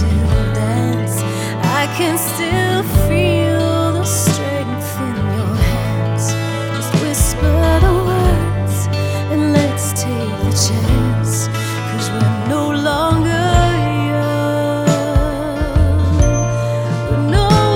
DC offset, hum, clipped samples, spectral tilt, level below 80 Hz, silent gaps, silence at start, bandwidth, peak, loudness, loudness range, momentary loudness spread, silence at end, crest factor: under 0.1%; none; under 0.1%; -5.5 dB/octave; -24 dBFS; none; 0 s; 18 kHz; 0 dBFS; -16 LUFS; 2 LU; 5 LU; 0 s; 14 dB